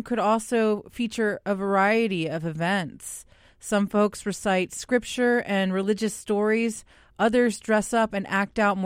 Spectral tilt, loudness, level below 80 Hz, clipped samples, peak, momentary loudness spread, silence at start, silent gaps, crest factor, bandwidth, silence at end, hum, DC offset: -5 dB/octave; -25 LUFS; -58 dBFS; under 0.1%; -8 dBFS; 7 LU; 0 s; none; 16 dB; 16 kHz; 0 s; none; under 0.1%